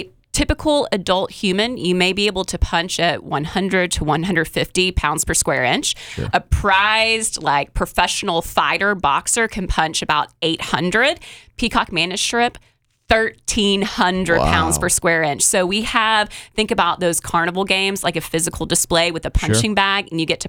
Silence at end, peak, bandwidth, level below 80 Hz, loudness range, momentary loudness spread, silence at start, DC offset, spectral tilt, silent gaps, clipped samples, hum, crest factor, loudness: 0 s; -2 dBFS; 19.5 kHz; -32 dBFS; 2 LU; 6 LU; 0 s; under 0.1%; -3 dB/octave; none; under 0.1%; none; 16 dB; -18 LUFS